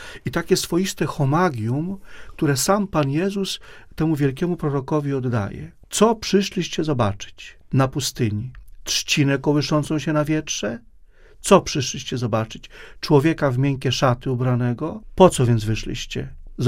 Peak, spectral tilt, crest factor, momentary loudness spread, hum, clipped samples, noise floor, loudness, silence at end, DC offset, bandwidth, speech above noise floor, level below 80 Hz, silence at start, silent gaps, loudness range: 0 dBFS; -5.5 dB/octave; 22 dB; 14 LU; none; under 0.1%; -47 dBFS; -21 LUFS; 0 s; under 0.1%; 16 kHz; 26 dB; -42 dBFS; 0 s; none; 3 LU